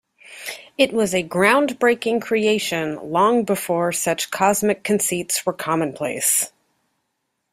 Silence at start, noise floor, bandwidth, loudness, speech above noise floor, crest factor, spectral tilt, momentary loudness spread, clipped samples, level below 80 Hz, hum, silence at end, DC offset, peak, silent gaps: 0.3 s; -75 dBFS; 16 kHz; -20 LUFS; 55 dB; 20 dB; -3 dB/octave; 7 LU; under 0.1%; -62 dBFS; none; 1.05 s; under 0.1%; -2 dBFS; none